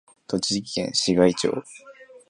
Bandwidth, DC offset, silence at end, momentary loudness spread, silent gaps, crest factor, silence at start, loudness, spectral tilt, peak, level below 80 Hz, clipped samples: 11.5 kHz; under 0.1%; 0.1 s; 9 LU; none; 22 dB; 0.3 s; -23 LUFS; -4 dB/octave; -4 dBFS; -56 dBFS; under 0.1%